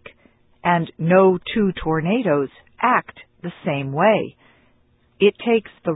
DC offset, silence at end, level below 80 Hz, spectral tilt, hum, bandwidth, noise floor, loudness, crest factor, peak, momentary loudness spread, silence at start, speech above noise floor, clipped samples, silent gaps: under 0.1%; 0 s; -50 dBFS; -11.5 dB/octave; none; 4 kHz; -59 dBFS; -20 LUFS; 18 dB; -2 dBFS; 11 LU; 0.65 s; 40 dB; under 0.1%; none